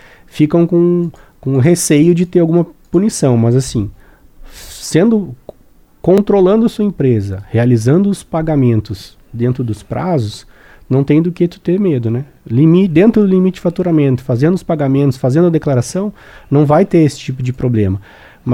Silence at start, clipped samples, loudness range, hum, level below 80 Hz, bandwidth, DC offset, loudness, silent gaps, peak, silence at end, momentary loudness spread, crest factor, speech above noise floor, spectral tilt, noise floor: 0.35 s; under 0.1%; 4 LU; none; -40 dBFS; 16 kHz; under 0.1%; -13 LUFS; none; 0 dBFS; 0 s; 11 LU; 12 dB; 34 dB; -7.5 dB/octave; -46 dBFS